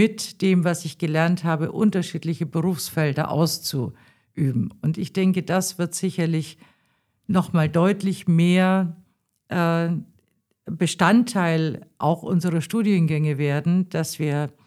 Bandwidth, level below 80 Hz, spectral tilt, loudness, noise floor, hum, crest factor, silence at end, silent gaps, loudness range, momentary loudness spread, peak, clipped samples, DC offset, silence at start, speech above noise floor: 14.5 kHz; -64 dBFS; -6 dB/octave; -22 LUFS; -68 dBFS; none; 20 dB; 0.15 s; none; 3 LU; 8 LU; -4 dBFS; under 0.1%; under 0.1%; 0 s; 46 dB